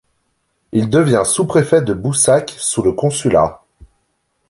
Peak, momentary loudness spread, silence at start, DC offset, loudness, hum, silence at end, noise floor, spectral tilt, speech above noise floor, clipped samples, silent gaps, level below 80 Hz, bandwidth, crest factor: -2 dBFS; 6 LU; 0.75 s; under 0.1%; -15 LUFS; none; 0.95 s; -66 dBFS; -5 dB/octave; 52 dB; under 0.1%; none; -44 dBFS; 11.5 kHz; 14 dB